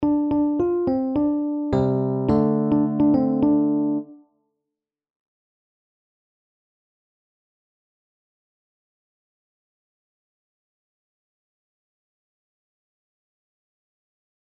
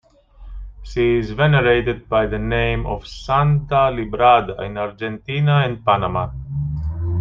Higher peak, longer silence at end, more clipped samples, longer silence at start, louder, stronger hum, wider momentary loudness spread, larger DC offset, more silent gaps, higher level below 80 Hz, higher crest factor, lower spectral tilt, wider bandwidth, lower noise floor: second, -8 dBFS vs -2 dBFS; first, 10.45 s vs 0 s; neither; second, 0 s vs 0.4 s; about the same, -21 LUFS vs -19 LUFS; neither; second, 4 LU vs 13 LU; neither; neither; second, -52 dBFS vs -34 dBFS; about the same, 18 dB vs 16 dB; first, -11 dB/octave vs -8 dB/octave; second, 5.2 kHz vs 7.2 kHz; first, -85 dBFS vs -41 dBFS